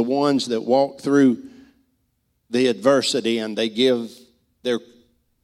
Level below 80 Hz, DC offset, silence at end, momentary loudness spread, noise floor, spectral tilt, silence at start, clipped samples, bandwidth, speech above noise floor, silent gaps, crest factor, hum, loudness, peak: -68 dBFS; under 0.1%; 0.65 s; 10 LU; -69 dBFS; -4.5 dB/octave; 0 s; under 0.1%; 13 kHz; 50 dB; none; 18 dB; none; -20 LUFS; -4 dBFS